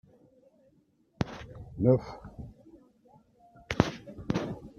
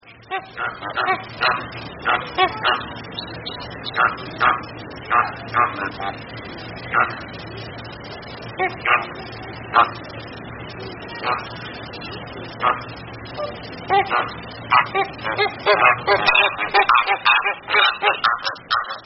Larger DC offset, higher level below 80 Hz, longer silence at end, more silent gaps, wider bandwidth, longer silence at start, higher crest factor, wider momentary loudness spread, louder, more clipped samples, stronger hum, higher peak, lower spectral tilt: neither; about the same, -54 dBFS vs -50 dBFS; about the same, 0.1 s vs 0 s; neither; first, 7.2 kHz vs 6 kHz; first, 1.2 s vs 0.05 s; first, 32 dB vs 22 dB; about the same, 20 LU vs 18 LU; second, -31 LUFS vs -20 LUFS; neither; neither; about the same, -2 dBFS vs 0 dBFS; first, -7 dB/octave vs -0.5 dB/octave